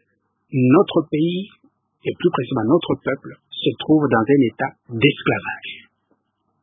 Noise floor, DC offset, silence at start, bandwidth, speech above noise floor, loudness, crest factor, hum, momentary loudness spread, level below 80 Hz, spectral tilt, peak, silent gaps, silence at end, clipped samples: -68 dBFS; under 0.1%; 0.5 s; 3.9 kHz; 50 dB; -19 LUFS; 18 dB; none; 14 LU; -56 dBFS; -11.5 dB/octave; -2 dBFS; none; 0.85 s; under 0.1%